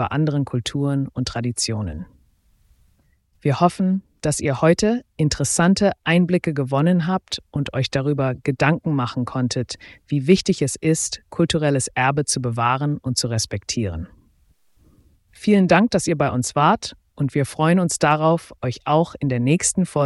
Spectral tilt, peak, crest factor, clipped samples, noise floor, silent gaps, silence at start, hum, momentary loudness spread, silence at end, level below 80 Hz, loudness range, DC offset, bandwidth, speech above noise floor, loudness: -5 dB/octave; -4 dBFS; 18 dB; under 0.1%; -61 dBFS; none; 0 s; none; 8 LU; 0 s; -48 dBFS; 5 LU; under 0.1%; 12 kHz; 41 dB; -20 LUFS